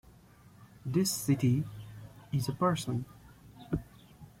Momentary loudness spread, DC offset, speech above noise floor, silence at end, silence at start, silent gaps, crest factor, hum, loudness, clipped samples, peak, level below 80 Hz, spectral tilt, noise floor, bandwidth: 20 LU; under 0.1%; 27 dB; 0.15 s; 0.6 s; none; 18 dB; none; -32 LUFS; under 0.1%; -16 dBFS; -56 dBFS; -5.5 dB/octave; -57 dBFS; 16.5 kHz